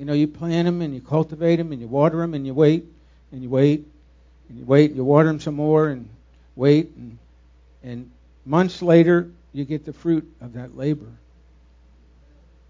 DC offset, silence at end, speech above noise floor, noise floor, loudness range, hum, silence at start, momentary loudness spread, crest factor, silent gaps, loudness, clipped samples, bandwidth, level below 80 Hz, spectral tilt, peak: under 0.1%; 1.6 s; 32 dB; -52 dBFS; 4 LU; none; 0 s; 20 LU; 20 dB; none; -20 LUFS; under 0.1%; 7.6 kHz; -52 dBFS; -8.5 dB/octave; 0 dBFS